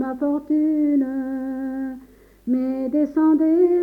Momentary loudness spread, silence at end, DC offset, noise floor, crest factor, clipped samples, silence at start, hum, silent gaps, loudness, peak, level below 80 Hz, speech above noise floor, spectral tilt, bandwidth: 12 LU; 0 s; under 0.1%; -46 dBFS; 12 dB; under 0.1%; 0 s; 50 Hz at -55 dBFS; none; -21 LUFS; -8 dBFS; -56 dBFS; 27 dB; -8.5 dB/octave; 2.5 kHz